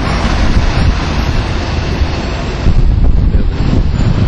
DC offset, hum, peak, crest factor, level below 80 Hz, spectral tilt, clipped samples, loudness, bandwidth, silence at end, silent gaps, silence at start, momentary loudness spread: under 0.1%; none; -2 dBFS; 10 dB; -12 dBFS; -6.5 dB/octave; under 0.1%; -14 LUFS; 9.6 kHz; 0 s; none; 0 s; 4 LU